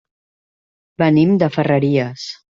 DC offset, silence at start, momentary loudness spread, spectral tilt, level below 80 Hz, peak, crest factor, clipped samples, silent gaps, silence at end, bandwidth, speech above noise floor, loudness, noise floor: under 0.1%; 1 s; 10 LU; -7.5 dB/octave; -56 dBFS; -2 dBFS; 16 dB; under 0.1%; none; 0.2 s; 7.4 kHz; over 74 dB; -16 LUFS; under -90 dBFS